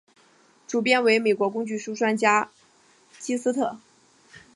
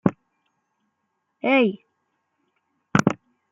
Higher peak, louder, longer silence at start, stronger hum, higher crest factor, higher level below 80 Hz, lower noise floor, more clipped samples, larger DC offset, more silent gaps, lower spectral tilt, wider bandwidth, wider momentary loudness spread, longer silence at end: about the same, -4 dBFS vs -2 dBFS; about the same, -23 LUFS vs -22 LUFS; first, 0.7 s vs 0.05 s; neither; about the same, 22 dB vs 24 dB; second, -76 dBFS vs -58 dBFS; second, -59 dBFS vs -76 dBFS; neither; neither; neither; second, -3.5 dB/octave vs -6 dB/octave; first, 11.5 kHz vs 10 kHz; second, 11 LU vs 14 LU; first, 0.8 s vs 0.35 s